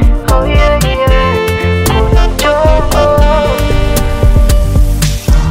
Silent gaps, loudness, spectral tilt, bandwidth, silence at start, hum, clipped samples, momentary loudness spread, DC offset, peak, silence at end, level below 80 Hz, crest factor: none; -11 LUFS; -5.5 dB/octave; 16.5 kHz; 0 s; none; 0.4%; 3 LU; under 0.1%; 0 dBFS; 0 s; -10 dBFS; 8 dB